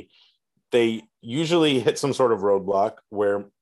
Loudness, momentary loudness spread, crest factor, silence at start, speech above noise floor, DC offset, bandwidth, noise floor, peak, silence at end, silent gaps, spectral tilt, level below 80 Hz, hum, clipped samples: -22 LUFS; 7 LU; 16 dB; 0.7 s; 42 dB; under 0.1%; 12.5 kHz; -64 dBFS; -8 dBFS; 0.15 s; none; -5 dB/octave; -70 dBFS; none; under 0.1%